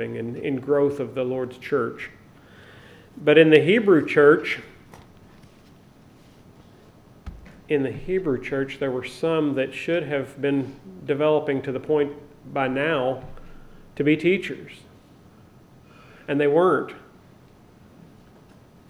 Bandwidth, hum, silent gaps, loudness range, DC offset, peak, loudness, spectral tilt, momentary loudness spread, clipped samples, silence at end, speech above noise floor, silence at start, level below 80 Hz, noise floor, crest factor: 11.5 kHz; none; none; 9 LU; under 0.1%; -2 dBFS; -22 LUFS; -7 dB/octave; 20 LU; under 0.1%; 1.9 s; 29 dB; 0 s; -52 dBFS; -51 dBFS; 22 dB